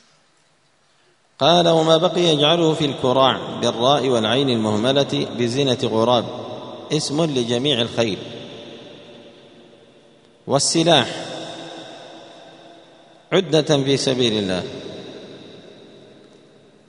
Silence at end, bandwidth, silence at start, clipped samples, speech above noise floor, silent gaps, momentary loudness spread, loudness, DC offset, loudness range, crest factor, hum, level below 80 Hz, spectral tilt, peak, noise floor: 1.15 s; 11 kHz; 1.4 s; under 0.1%; 42 dB; none; 21 LU; -18 LUFS; under 0.1%; 6 LU; 20 dB; none; -60 dBFS; -4.5 dB/octave; 0 dBFS; -60 dBFS